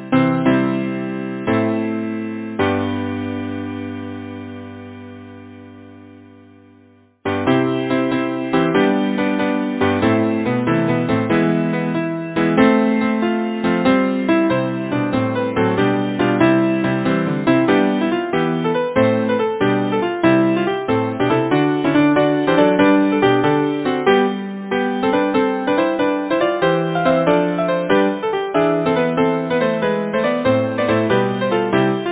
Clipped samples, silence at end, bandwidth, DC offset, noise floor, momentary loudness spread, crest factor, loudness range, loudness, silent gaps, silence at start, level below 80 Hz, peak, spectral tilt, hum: under 0.1%; 0 s; 4 kHz; under 0.1%; -50 dBFS; 9 LU; 16 dB; 9 LU; -17 LUFS; none; 0 s; -50 dBFS; 0 dBFS; -10.5 dB/octave; none